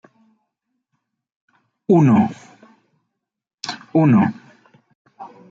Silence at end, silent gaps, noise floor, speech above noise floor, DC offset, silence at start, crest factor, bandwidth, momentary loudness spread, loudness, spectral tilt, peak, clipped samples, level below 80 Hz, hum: 0.25 s; 3.54-3.58 s, 4.95-5.05 s; -76 dBFS; 62 dB; under 0.1%; 1.9 s; 18 dB; 7.8 kHz; 21 LU; -17 LUFS; -8 dB/octave; -4 dBFS; under 0.1%; -64 dBFS; none